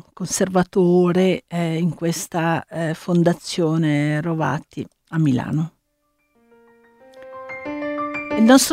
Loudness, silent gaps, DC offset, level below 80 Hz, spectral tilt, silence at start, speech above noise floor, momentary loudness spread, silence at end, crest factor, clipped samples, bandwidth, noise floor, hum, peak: -20 LUFS; none; under 0.1%; -58 dBFS; -5.5 dB/octave; 0.2 s; 50 dB; 14 LU; 0 s; 18 dB; under 0.1%; 16 kHz; -68 dBFS; none; -2 dBFS